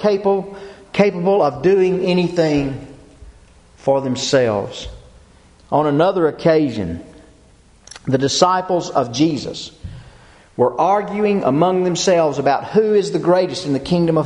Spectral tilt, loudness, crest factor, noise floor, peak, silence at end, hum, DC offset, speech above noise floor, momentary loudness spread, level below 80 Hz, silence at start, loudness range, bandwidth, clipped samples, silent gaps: -5.5 dB/octave; -17 LUFS; 18 dB; -49 dBFS; 0 dBFS; 0 s; none; under 0.1%; 33 dB; 14 LU; -46 dBFS; 0 s; 4 LU; 10.5 kHz; under 0.1%; none